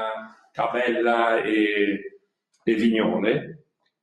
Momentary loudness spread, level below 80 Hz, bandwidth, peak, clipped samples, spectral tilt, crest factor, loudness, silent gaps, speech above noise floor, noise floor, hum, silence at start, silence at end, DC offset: 15 LU; -68 dBFS; 10 kHz; -6 dBFS; under 0.1%; -6.5 dB/octave; 18 dB; -23 LUFS; none; 39 dB; -61 dBFS; none; 0 s; 0.45 s; under 0.1%